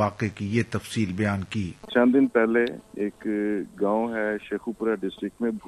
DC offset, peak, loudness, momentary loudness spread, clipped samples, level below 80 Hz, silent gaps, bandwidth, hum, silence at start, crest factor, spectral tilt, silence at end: under 0.1%; -6 dBFS; -26 LUFS; 11 LU; under 0.1%; -58 dBFS; none; 12.5 kHz; none; 0 s; 18 dB; -7 dB/octave; 0 s